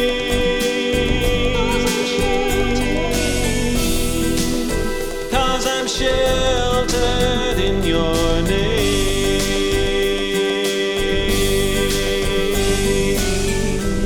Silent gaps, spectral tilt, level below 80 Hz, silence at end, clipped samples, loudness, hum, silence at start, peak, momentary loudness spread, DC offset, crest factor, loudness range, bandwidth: none; -4 dB/octave; -24 dBFS; 0 s; under 0.1%; -18 LUFS; none; 0 s; -4 dBFS; 2 LU; under 0.1%; 14 dB; 1 LU; 19 kHz